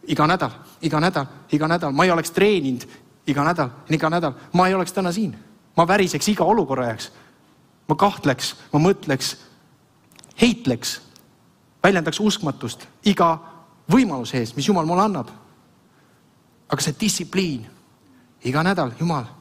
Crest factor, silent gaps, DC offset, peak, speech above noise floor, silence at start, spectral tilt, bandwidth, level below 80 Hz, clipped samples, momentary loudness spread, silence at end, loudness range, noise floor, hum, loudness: 20 dB; none; under 0.1%; -2 dBFS; 36 dB; 0.05 s; -5 dB/octave; 16 kHz; -54 dBFS; under 0.1%; 10 LU; 0.1 s; 4 LU; -57 dBFS; none; -21 LUFS